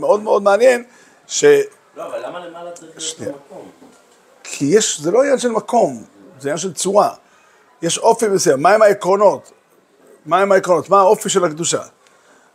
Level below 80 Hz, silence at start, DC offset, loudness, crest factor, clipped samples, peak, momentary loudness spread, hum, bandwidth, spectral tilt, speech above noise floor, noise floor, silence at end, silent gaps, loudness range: -70 dBFS; 0 s; under 0.1%; -15 LUFS; 16 dB; under 0.1%; 0 dBFS; 17 LU; none; 16 kHz; -3.5 dB/octave; 37 dB; -52 dBFS; 0.7 s; none; 6 LU